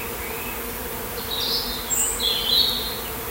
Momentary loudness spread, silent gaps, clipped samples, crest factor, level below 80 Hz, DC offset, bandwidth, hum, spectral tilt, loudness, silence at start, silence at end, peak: 11 LU; none; under 0.1%; 20 dB; -42 dBFS; under 0.1%; 16 kHz; none; -1 dB/octave; -22 LUFS; 0 s; 0 s; -6 dBFS